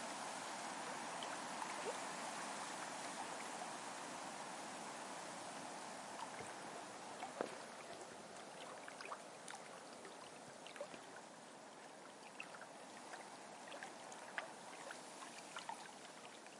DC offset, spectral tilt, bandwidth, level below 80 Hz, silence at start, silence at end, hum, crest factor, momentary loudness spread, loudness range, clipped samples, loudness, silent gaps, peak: under 0.1%; -2 dB/octave; 11.5 kHz; under -90 dBFS; 0 s; 0 s; none; 28 dB; 8 LU; 8 LU; under 0.1%; -50 LUFS; none; -22 dBFS